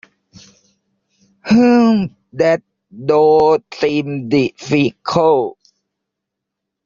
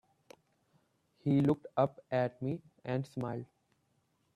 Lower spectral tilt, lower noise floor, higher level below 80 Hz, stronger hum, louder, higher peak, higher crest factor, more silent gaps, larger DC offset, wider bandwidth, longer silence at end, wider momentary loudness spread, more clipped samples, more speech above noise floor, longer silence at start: second, -5.5 dB/octave vs -9 dB/octave; first, -80 dBFS vs -76 dBFS; first, -54 dBFS vs -72 dBFS; neither; first, -15 LUFS vs -35 LUFS; first, -2 dBFS vs -16 dBFS; second, 14 dB vs 20 dB; neither; neither; second, 7.4 kHz vs 10.5 kHz; first, 1.35 s vs 0.9 s; about the same, 10 LU vs 12 LU; neither; first, 66 dB vs 43 dB; first, 1.45 s vs 1.25 s